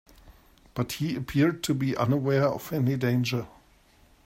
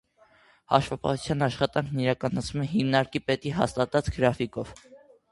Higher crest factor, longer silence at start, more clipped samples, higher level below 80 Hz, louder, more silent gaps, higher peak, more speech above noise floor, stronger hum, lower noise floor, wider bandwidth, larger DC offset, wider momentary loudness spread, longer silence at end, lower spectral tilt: second, 18 dB vs 24 dB; second, 0.25 s vs 0.7 s; neither; second, -56 dBFS vs -48 dBFS; about the same, -27 LUFS vs -27 LUFS; neither; second, -10 dBFS vs -4 dBFS; about the same, 33 dB vs 33 dB; neither; about the same, -59 dBFS vs -60 dBFS; first, 16 kHz vs 11.5 kHz; neither; first, 9 LU vs 5 LU; first, 0.75 s vs 0.35 s; about the same, -6.5 dB/octave vs -6 dB/octave